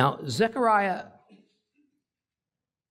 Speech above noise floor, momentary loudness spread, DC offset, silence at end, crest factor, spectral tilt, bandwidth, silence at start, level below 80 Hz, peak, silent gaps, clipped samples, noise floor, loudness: over 65 dB; 8 LU; under 0.1%; 1.85 s; 22 dB; -5.5 dB/octave; 16 kHz; 0 s; -68 dBFS; -6 dBFS; none; under 0.1%; under -90 dBFS; -25 LUFS